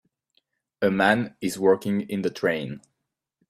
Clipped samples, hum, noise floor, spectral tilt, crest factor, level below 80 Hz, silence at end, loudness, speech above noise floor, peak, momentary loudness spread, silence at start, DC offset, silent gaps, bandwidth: under 0.1%; none; -78 dBFS; -5.5 dB/octave; 22 dB; -64 dBFS; 0.7 s; -24 LUFS; 54 dB; -4 dBFS; 9 LU; 0.8 s; under 0.1%; none; 15 kHz